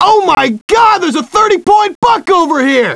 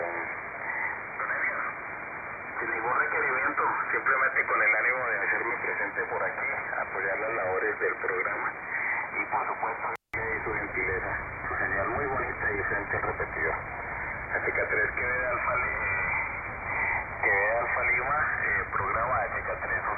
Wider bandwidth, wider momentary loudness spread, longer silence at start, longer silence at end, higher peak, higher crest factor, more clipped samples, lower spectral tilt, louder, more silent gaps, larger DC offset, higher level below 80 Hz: first, 11 kHz vs 5.4 kHz; second, 4 LU vs 8 LU; about the same, 0 s vs 0 s; about the same, 0 s vs 0 s; first, 0 dBFS vs -14 dBFS; second, 10 dB vs 16 dB; first, 0.2% vs under 0.1%; second, -3.5 dB/octave vs -9 dB/octave; first, -9 LUFS vs -28 LUFS; first, 0.61-0.68 s, 1.95-2.02 s vs none; neither; first, -44 dBFS vs -50 dBFS